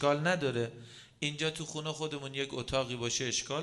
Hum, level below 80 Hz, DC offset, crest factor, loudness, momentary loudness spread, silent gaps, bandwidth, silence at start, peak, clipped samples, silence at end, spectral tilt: none; -60 dBFS; under 0.1%; 18 dB; -34 LUFS; 8 LU; none; 11.5 kHz; 0 s; -16 dBFS; under 0.1%; 0 s; -3.5 dB/octave